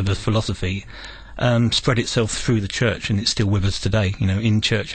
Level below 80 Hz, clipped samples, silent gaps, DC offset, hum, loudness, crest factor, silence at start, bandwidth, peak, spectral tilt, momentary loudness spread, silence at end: -36 dBFS; under 0.1%; none; under 0.1%; none; -20 LUFS; 14 dB; 0 s; 9.2 kHz; -6 dBFS; -5 dB/octave; 8 LU; 0 s